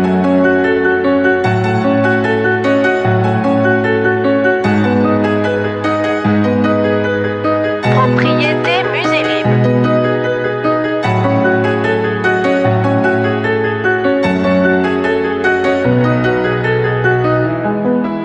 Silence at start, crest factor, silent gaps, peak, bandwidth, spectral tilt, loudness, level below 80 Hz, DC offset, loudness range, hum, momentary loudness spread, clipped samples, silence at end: 0 s; 12 dB; none; 0 dBFS; 8.6 kHz; -7.5 dB/octave; -13 LUFS; -46 dBFS; under 0.1%; 1 LU; none; 3 LU; under 0.1%; 0 s